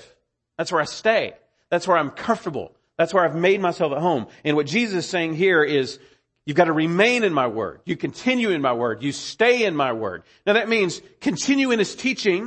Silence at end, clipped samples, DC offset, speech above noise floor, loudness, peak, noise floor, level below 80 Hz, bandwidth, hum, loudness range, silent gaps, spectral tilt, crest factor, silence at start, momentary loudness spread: 0 s; under 0.1%; under 0.1%; 40 dB; -21 LUFS; -4 dBFS; -61 dBFS; -64 dBFS; 8.8 kHz; none; 2 LU; none; -4.5 dB/octave; 18 dB; 0.6 s; 10 LU